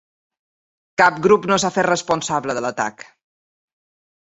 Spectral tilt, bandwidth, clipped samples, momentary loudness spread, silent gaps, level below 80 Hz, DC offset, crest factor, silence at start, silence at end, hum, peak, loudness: -4 dB/octave; 8.2 kHz; under 0.1%; 10 LU; none; -58 dBFS; under 0.1%; 20 dB; 1 s; 1.2 s; none; -2 dBFS; -18 LUFS